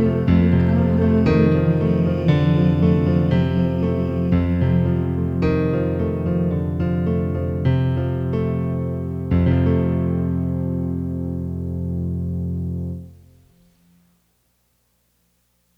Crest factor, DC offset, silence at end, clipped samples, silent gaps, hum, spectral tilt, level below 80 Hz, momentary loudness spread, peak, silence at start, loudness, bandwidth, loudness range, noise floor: 14 dB; under 0.1%; 2.65 s; under 0.1%; none; 60 Hz at -45 dBFS; -10.5 dB/octave; -36 dBFS; 9 LU; -4 dBFS; 0 s; -20 LUFS; 5.4 kHz; 11 LU; -65 dBFS